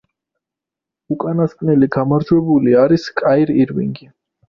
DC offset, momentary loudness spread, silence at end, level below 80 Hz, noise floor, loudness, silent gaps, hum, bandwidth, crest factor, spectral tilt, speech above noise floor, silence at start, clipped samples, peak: under 0.1%; 11 LU; 0.5 s; -52 dBFS; -85 dBFS; -15 LUFS; none; none; 7 kHz; 14 dB; -9 dB/octave; 71 dB; 1.1 s; under 0.1%; -2 dBFS